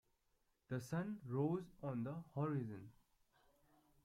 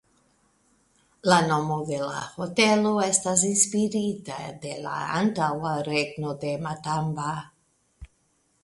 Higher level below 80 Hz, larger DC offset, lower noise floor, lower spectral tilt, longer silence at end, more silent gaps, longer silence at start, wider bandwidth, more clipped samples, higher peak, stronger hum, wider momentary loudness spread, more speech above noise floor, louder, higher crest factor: second, -78 dBFS vs -58 dBFS; neither; first, -82 dBFS vs -69 dBFS; first, -8.5 dB/octave vs -3.5 dB/octave; first, 1.1 s vs 0.6 s; neither; second, 0.7 s vs 1.25 s; first, 15.5 kHz vs 11.5 kHz; neither; second, -28 dBFS vs -4 dBFS; neither; second, 9 LU vs 12 LU; second, 38 dB vs 43 dB; second, -45 LUFS vs -25 LUFS; about the same, 18 dB vs 22 dB